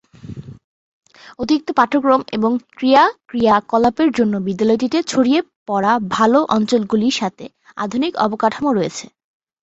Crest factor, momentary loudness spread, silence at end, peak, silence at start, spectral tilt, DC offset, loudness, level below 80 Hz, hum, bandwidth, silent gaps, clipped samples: 16 dB; 11 LU; 0.6 s; -2 dBFS; 0.25 s; -5 dB/octave; under 0.1%; -17 LUFS; -54 dBFS; none; 8.2 kHz; 0.64-1.01 s, 5.56-5.66 s; under 0.1%